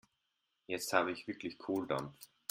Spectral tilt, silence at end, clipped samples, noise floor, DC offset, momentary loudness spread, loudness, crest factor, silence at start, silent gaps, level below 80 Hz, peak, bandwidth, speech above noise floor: -4 dB/octave; 0.25 s; under 0.1%; -84 dBFS; under 0.1%; 11 LU; -38 LUFS; 26 dB; 0.7 s; none; -76 dBFS; -12 dBFS; 16 kHz; 46 dB